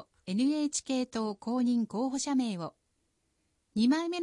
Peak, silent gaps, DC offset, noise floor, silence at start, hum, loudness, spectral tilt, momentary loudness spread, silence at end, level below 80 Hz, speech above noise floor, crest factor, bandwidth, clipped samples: -18 dBFS; none; under 0.1%; -77 dBFS; 0 s; none; -31 LUFS; -4.5 dB/octave; 8 LU; 0 s; -72 dBFS; 47 dB; 14 dB; 11 kHz; under 0.1%